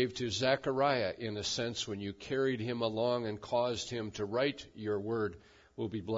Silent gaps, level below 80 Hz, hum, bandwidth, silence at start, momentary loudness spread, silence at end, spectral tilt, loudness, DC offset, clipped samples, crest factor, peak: none; -66 dBFS; none; 7.4 kHz; 0 s; 9 LU; 0 s; -3.5 dB/octave; -34 LUFS; under 0.1%; under 0.1%; 18 dB; -16 dBFS